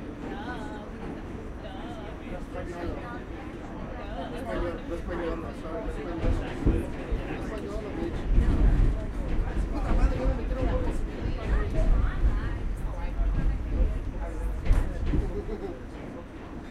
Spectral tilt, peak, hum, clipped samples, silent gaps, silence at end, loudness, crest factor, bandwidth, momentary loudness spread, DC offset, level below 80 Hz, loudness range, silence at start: -8 dB/octave; -10 dBFS; none; under 0.1%; none; 0 s; -32 LUFS; 18 dB; 9.8 kHz; 11 LU; under 0.1%; -30 dBFS; 8 LU; 0 s